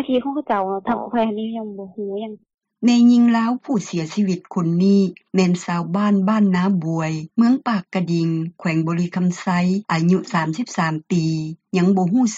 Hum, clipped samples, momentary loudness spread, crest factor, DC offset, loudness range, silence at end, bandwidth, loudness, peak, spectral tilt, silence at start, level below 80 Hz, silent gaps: none; under 0.1%; 8 LU; 14 dB; under 0.1%; 3 LU; 0 s; 8 kHz; -20 LUFS; -6 dBFS; -7 dB/octave; 0 s; -62 dBFS; 2.54-2.58 s